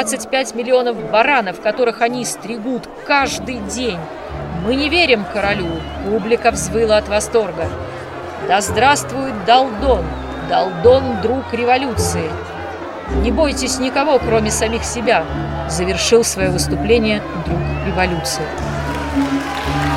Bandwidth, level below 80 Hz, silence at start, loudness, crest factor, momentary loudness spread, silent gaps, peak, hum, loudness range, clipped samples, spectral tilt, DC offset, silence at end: 16 kHz; -32 dBFS; 0 s; -17 LUFS; 16 dB; 11 LU; none; 0 dBFS; none; 3 LU; under 0.1%; -4 dB/octave; under 0.1%; 0 s